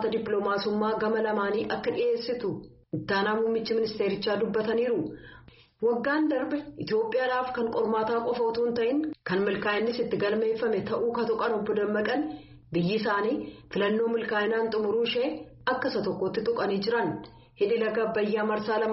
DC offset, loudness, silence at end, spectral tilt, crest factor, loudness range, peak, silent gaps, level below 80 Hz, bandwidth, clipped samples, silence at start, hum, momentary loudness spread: under 0.1%; -28 LUFS; 0 s; -4 dB/octave; 16 dB; 1 LU; -12 dBFS; none; -62 dBFS; 6 kHz; under 0.1%; 0 s; none; 5 LU